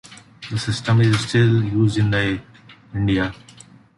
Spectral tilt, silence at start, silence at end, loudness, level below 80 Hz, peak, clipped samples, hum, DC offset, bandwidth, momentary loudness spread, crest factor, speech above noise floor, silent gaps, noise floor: -6.5 dB/octave; 0.05 s; 0.65 s; -20 LUFS; -44 dBFS; -6 dBFS; under 0.1%; none; under 0.1%; 11.5 kHz; 12 LU; 14 dB; 28 dB; none; -46 dBFS